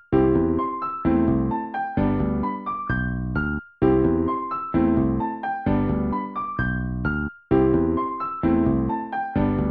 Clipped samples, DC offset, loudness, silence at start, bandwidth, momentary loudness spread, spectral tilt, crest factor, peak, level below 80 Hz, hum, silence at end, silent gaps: under 0.1%; under 0.1%; -23 LUFS; 0.1 s; 4.5 kHz; 7 LU; -11.5 dB/octave; 14 dB; -8 dBFS; -36 dBFS; none; 0 s; none